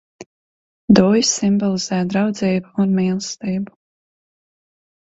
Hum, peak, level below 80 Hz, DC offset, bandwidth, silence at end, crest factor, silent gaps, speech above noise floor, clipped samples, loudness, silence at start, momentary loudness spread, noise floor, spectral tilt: none; 0 dBFS; -54 dBFS; under 0.1%; 8 kHz; 1.35 s; 20 dB; 0.26-0.88 s; over 73 dB; under 0.1%; -18 LUFS; 0.2 s; 11 LU; under -90 dBFS; -5 dB/octave